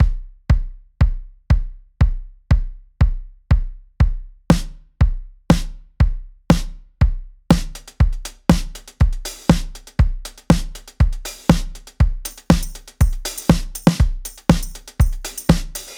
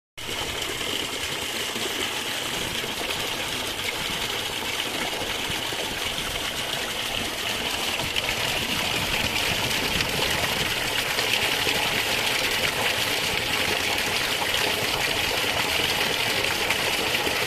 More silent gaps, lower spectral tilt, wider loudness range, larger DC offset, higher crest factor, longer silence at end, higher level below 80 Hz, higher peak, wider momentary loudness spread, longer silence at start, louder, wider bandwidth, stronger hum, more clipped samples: neither; first, -6.5 dB/octave vs -1.5 dB/octave; about the same, 2 LU vs 4 LU; neither; about the same, 18 dB vs 20 dB; about the same, 0 s vs 0 s; first, -22 dBFS vs -46 dBFS; first, 0 dBFS vs -6 dBFS; first, 17 LU vs 5 LU; second, 0 s vs 0.15 s; first, -20 LUFS vs -24 LUFS; first, 19 kHz vs 14.5 kHz; neither; neither